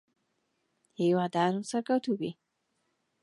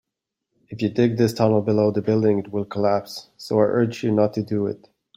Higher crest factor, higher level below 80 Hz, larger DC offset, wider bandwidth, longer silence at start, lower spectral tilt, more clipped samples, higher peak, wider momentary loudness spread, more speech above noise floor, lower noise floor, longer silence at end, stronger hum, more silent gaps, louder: about the same, 18 dB vs 18 dB; second, -80 dBFS vs -60 dBFS; neither; second, 11.5 kHz vs 16 kHz; first, 1 s vs 0.7 s; second, -6 dB/octave vs -7.5 dB/octave; neither; second, -14 dBFS vs -4 dBFS; about the same, 7 LU vs 9 LU; second, 49 dB vs 62 dB; second, -78 dBFS vs -82 dBFS; first, 0.9 s vs 0.4 s; neither; neither; second, -30 LUFS vs -21 LUFS